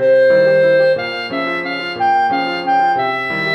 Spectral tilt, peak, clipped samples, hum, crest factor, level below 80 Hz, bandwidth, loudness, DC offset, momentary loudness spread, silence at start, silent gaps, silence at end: -6 dB/octave; -4 dBFS; under 0.1%; none; 10 dB; -60 dBFS; 6.2 kHz; -15 LUFS; under 0.1%; 9 LU; 0 s; none; 0 s